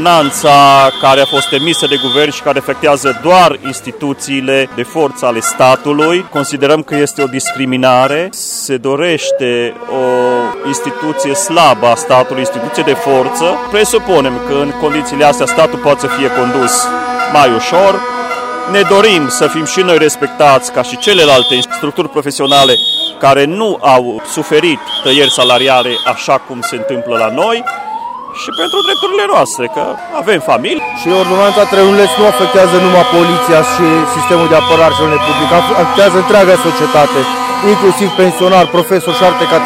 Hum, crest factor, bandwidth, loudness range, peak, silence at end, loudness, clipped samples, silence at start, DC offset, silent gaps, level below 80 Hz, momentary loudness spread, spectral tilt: none; 10 dB; 16.5 kHz; 4 LU; 0 dBFS; 0 s; -9 LUFS; 0.6%; 0 s; under 0.1%; none; -48 dBFS; 9 LU; -3.5 dB/octave